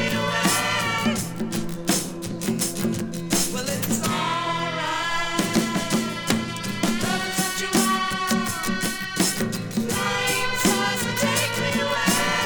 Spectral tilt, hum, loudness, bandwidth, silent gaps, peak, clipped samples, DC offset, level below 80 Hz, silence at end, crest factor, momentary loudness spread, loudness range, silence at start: -3 dB/octave; none; -23 LUFS; over 20 kHz; none; -4 dBFS; under 0.1%; under 0.1%; -48 dBFS; 0 s; 20 dB; 6 LU; 2 LU; 0 s